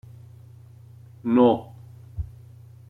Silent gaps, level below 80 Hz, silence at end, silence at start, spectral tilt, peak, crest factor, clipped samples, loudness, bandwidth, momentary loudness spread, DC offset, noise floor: none; -48 dBFS; 0.65 s; 1.25 s; -9.5 dB/octave; -6 dBFS; 20 dB; under 0.1%; -21 LUFS; 4.1 kHz; 25 LU; under 0.1%; -47 dBFS